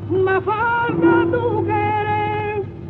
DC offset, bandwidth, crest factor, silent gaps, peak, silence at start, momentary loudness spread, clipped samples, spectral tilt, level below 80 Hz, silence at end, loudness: under 0.1%; 4.4 kHz; 14 dB; none; -4 dBFS; 0 s; 6 LU; under 0.1%; -10 dB/octave; -46 dBFS; 0 s; -18 LUFS